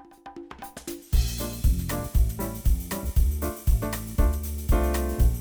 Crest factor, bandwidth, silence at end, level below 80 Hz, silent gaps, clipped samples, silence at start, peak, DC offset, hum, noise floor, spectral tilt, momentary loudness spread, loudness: 16 dB; over 20 kHz; 0 s; -26 dBFS; none; under 0.1%; 0.25 s; -10 dBFS; under 0.1%; none; -44 dBFS; -5.5 dB/octave; 14 LU; -27 LUFS